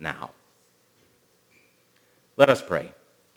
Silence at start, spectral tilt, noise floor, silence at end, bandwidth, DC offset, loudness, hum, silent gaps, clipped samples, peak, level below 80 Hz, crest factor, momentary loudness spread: 0 s; -5 dB/octave; -63 dBFS; 0.5 s; 17 kHz; under 0.1%; -22 LUFS; 60 Hz at -70 dBFS; none; under 0.1%; 0 dBFS; -64 dBFS; 28 dB; 23 LU